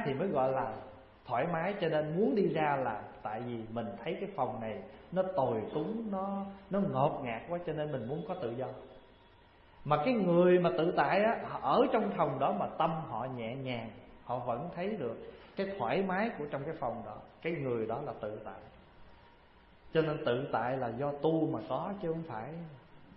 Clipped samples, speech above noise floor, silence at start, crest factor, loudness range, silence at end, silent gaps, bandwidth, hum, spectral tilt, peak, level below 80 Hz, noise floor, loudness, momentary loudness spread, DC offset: under 0.1%; 27 dB; 0 s; 20 dB; 8 LU; 0 s; none; 5.6 kHz; none; -10.5 dB/octave; -14 dBFS; -64 dBFS; -60 dBFS; -34 LUFS; 13 LU; under 0.1%